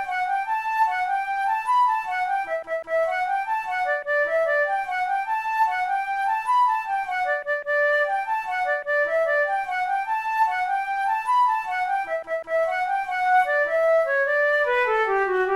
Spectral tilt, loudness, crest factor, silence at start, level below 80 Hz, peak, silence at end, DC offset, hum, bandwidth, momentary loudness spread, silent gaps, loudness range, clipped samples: -2.5 dB/octave; -23 LUFS; 14 dB; 0 s; -62 dBFS; -10 dBFS; 0 s; under 0.1%; none; 14 kHz; 5 LU; none; 2 LU; under 0.1%